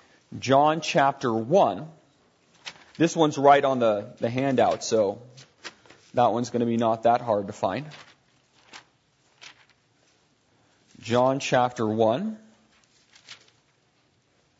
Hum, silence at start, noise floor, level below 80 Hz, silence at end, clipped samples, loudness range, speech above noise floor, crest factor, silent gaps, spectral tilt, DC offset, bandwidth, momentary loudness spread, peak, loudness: none; 0.3 s; -66 dBFS; -68 dBFS; 1.25 s; under 0.1%; 7 LU; 43 dB; 22 dB; none; -5.5 dB/octave; under 0.1%; 8 kHz; 22 LU; -4 dBFS; -23 LUFS